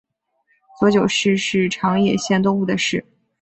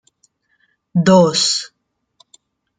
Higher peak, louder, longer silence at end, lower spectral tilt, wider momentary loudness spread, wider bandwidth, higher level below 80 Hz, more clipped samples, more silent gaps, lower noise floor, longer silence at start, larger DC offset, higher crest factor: about the same, -4 dBFS vs -2 dBFS; second, -18 LUFS vs -14 LUFS; second, 0.4 s vs 1.15 s; about the same, -5 dB/octave vs -4.5 dB/octave; second, 4 LU vs 11 LU; second, 8.2 kHz vs 9.6 kHz; about the same, -56 dBFS vs -60 dBFS; neither; neither; about the same, -66 dBFS vs -63 dBFS; second, 0.8 s vs 0.95 s; neither; about the same, 16 dB vs 18 dB